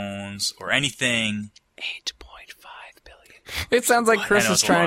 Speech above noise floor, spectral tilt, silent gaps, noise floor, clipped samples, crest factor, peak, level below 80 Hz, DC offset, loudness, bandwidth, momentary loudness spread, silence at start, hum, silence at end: 29 dB; -2.5 dB/octave; none; -50 dBFS; under 0.1%; 20 dB; -4 dBFS; -52 dBFS; under 0.1%; -22 LUFS; 16 kHz; 23 LU; 0 s; none; 0 s